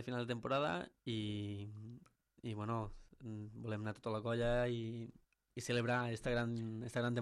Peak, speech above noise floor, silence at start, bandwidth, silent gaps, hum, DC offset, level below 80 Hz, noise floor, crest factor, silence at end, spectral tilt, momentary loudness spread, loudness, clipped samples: -26 dBFS; 22 dB; 0 s; 12.5 kHz; none; none; under 0.1%; -58 dBFS; -62 dBFS; 16 dB; 0 s; -6 dB/octave; 14 LU; -41 LUFS; under 0.1%